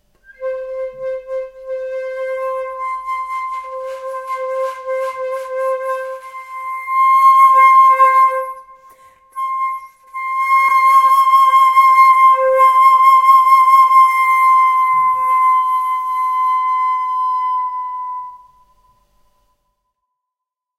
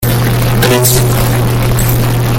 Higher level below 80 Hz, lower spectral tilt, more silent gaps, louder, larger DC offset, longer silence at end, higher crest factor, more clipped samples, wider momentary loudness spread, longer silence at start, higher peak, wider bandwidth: second, -60 dBFS vs -20 dBFS; second, 0.5 dB/octave vs -5 dB/octave; neither; about the same, -12 LUFS vs -10 LUFS; neither; first, 2.45 s vs 0 s; about the same, 14 dB vs 10 dB; neither; first, 18 LU vs 3 LU; first, 0.4 s vs 0 s; about the same, -2 dBFS vs 0 dBFS; second, 15.5 kHz vs 17.5 kHz